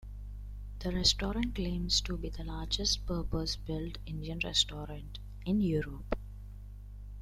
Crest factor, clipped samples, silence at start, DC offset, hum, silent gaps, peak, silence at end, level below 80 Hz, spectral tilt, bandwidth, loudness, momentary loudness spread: 22 dB; under 0.1%; 0 s; under 0.1%; 50 Hz at -40 dBFS; none; -12 dBFS; 0 s; -42 dBFS; -4 dB/octave; 14 kHz; -33 LUFS; 19 LU